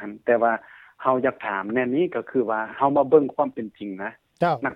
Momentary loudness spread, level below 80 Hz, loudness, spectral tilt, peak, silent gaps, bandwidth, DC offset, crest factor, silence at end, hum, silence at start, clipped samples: 13 LU; -66 dBFS; -23 LUFS; -8.5 dB/octave; -4 dBFS; none; 5.4 kHz; under 0.1%; 20 dB; 0 s; none; 0 s; under 0.1%